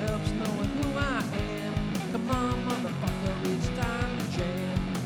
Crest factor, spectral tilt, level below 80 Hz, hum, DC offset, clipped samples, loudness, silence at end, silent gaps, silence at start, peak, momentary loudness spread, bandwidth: 16 dB; -6 dB/octave; -40 dBFS; none; under 0.1%; under 0.1%; -30 LUFS; 0 s; none; 0 s; -14 dBFS; 3 LU; over 20 kHz